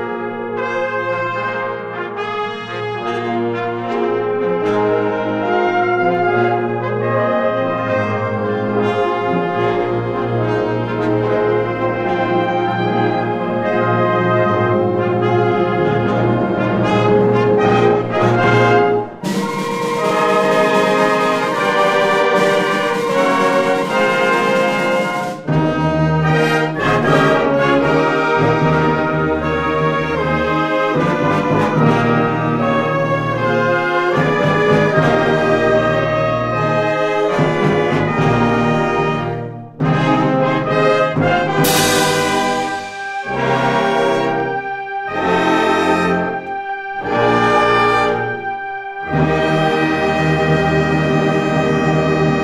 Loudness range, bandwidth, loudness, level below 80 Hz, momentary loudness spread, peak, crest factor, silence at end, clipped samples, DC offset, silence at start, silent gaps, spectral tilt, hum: 3 LU; 16 kHz; -16 LUFS; -42 dBFS; 7 LU; 0 dBFS; 16 dB; 0 s; under 0.1%; under 0.1%; 0 s; none; -6 dB/octave; none